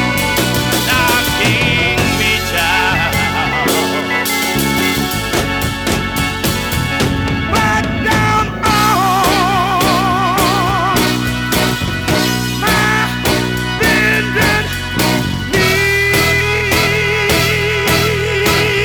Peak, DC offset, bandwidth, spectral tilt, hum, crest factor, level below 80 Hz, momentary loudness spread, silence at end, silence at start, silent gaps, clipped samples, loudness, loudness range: 0 dBFS; under 0.1%; over 20 kHz; -4 dB/octave; none; 14 dB; -30 dBFS; 4 LU; 0 s; 0 s; none; under 0.1%; -13 LUFS; 3 LU